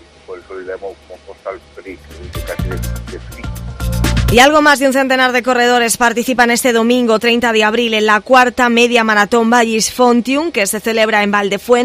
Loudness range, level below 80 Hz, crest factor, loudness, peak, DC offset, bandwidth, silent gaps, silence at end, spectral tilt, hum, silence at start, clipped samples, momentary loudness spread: 15 LU; -30 dBFS; 14 dB; -12 LUFS; 0 dBFS; under 0.1%; 16 kHz; none; 0 s; -3.5 dB/octave; none; 0.3 s; 0.2%; 19 LU